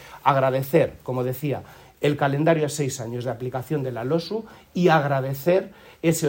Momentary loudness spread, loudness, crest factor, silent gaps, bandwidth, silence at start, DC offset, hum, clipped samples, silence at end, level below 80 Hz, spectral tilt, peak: 10 LU; -24 LUFS; 20 dB; none; 16.5 kHz; 0 s; under 0.1%; none; under 0.1%; 0 s; -60 dBFS; -6 dB/octave; -4 dBFS